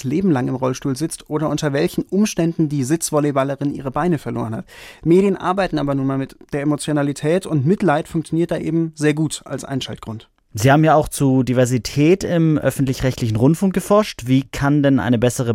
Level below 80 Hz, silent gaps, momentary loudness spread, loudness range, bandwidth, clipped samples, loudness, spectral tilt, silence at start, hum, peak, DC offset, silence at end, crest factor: -44 dBFS; none; 10 LU; 3 LU; 16.5 kHz; under 0.1%; -18 LUFS; -6.5 dB/octave; 0 s; none; -2 dBFS; under 0.1%; 0 s; 16 dB